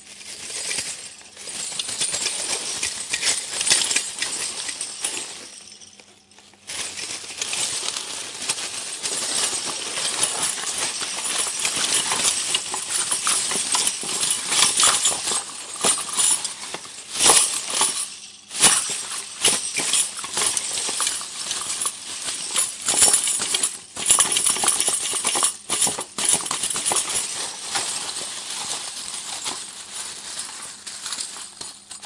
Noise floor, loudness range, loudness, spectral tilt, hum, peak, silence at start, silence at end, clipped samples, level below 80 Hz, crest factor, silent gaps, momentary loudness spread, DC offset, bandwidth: -51 dBFS; 9 LU; -20 LUFS; 1 dB/octave; none; 0 dBFS; 0 s; 0 s; under 0.1%; -62 dBFS; 24 dB; none; 15 LU; under 0.1%; 12 kHz